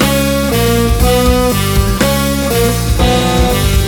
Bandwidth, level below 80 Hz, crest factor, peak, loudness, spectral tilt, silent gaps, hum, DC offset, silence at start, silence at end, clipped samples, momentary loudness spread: 19.5 kHz; -18 dBFS; 10 dB; 0 dBFS; -12 LUFS; -5 dB/octave; none; none; under 0.1%; 0 s; 0 s; under 0.1%; 2 LU